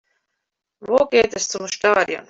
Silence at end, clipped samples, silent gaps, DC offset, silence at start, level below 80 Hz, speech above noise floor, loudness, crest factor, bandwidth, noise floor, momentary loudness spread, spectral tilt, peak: 0.1 s; under 0.1%; none; under 0.1%; 0.8 s; -56 dBFS; 61 dB; -19 LUFS; 18 dB; 8 kHz; -80 dBFS; 8 LU; -2 dB/octave; -4 dBFS